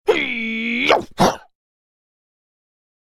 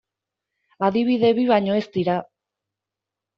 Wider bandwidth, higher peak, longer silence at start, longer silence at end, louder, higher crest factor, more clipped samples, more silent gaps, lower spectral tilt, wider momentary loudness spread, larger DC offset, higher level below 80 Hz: first, 16.5 kHz vs 6.4 kHz; first, 0 dBFS vs -4 dBFS; second, 0.05 s vs 0.8 s; first, 1.65 s vs 1.15 s; first, -18 LUFS vs -21 LUFS; about the same, 22 dB vs 18 dB; neither; neither; about the same, -4 dB/octave vs -5 dB/octave; about the same, 5 LU vs 6 LU; neither; first, -48 dBFS vs -66 dBFS